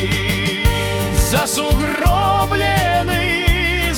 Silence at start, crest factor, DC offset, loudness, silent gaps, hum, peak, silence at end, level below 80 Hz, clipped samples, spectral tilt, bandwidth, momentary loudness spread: 0 s; 14 dB; under 0.1%; -16 LUFS; none; none; -2 dBFS; 0 s; -22 dBFS; under 0.1%; -4 dB/octave; 18 kHz; 2 LU